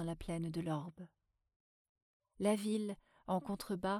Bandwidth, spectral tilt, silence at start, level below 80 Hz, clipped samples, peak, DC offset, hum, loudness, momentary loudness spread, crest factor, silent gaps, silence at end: 15.5 kHz; -6 dB/octave; 0 s; -64 dBFS; under 0.1%; -22 dBFS; under 0.1%; none; -40 LUFS; 15 LU; 20 dB; 1.56-1.95 s, 2.02-2.20 s; 0 s